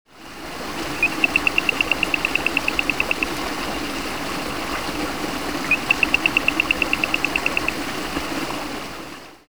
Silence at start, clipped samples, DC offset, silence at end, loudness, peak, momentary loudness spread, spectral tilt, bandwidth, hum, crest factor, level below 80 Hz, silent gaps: 0.05 s; under 0.1%; 1%; 0 s; -21 LUFS; -2 dBFS; 12 LU; -2.5 dB/octave; over 20 kHz; none; 22 dB; -42 dBFS; none